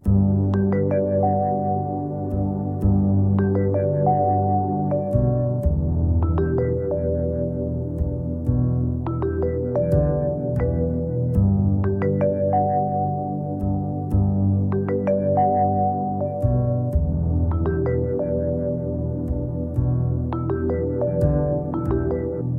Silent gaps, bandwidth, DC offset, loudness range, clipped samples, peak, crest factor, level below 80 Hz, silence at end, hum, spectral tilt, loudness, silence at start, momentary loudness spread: none; 2.6 kHz; under 0.1%; 3 LU; under 0.1%; -6 dBFS; 14 dB; -32 dBFS; 0 s; none; -12.5 dB/octave; -22 LUFS; 0.05 s; 6 LU